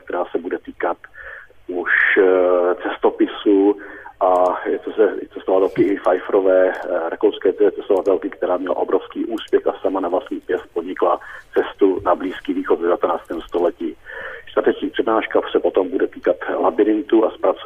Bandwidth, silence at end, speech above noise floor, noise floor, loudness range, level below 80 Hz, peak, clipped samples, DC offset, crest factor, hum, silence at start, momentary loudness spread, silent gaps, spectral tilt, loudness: 7.8 kHz; 0 s; 20 dB; -38 dBFS; 4 LU; -54 dBFS; -4 dBFS; under 0.1%; under 0.1%; 14 dB; none; 0.05 s; 10 LU; none; -6.5 dB/octave; -19 LUFS